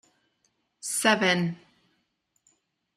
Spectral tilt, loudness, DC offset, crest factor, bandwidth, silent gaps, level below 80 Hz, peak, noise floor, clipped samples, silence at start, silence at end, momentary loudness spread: -3.5 dB/octave; -24 LUFS; under 0.1%; 24 dB; 14.5 kHz; none; -76 dBFS; -6 dBFS; -75 dBFS; under 0.1%; 0.85 s; 1.4 s; 17 LU